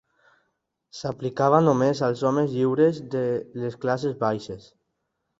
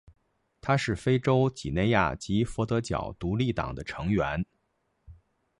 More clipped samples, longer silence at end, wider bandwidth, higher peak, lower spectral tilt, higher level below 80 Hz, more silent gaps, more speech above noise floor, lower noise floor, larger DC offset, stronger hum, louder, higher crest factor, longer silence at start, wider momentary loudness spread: neither; first, 0.8 s vs 0.45 s; second, 7.8 kHz vs 11.5 kHz; first, -4 dBFS vs -8 dBFS; about the same, -7.5 dB/octave vs -6.5 dB/octave; second, -62 dBFS vs -46 dBFS; neither; first, 54 dB vs 48 dB; about the same, -78 dBFS vs -75 dBFS; neither; neither; first, -24 LUFS vs -28 LUFS; about the same, 20 dB vs 20 dB; first, 0.95 s vs 0.65 s; first, 14 LU vs 9 LU